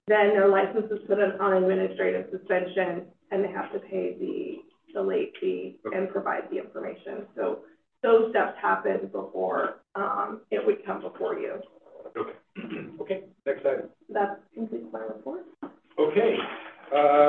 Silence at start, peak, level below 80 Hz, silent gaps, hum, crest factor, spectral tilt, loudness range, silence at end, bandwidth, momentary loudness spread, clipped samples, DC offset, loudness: 0.05 s; -8 dBFS; -78 dBFS; none; none; 20 dB; -8.5 dB/octave; 6 LU; 0 s; 4.2 kHz; 16 LU; under 0.1%; under 0.1%; -28 LUFS